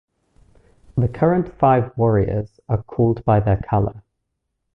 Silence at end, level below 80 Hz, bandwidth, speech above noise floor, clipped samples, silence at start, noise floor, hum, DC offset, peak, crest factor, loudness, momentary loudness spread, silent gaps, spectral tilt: 0.75 s; -38 dBFS; 3.7 kHz; 57 dB; under 0.1%; 0.95 s; -76 dBFS; none; under 0.1%; -2 dBFS; 18 dB; -20 LUFS; 9 LU; none; -11.5 dB/octave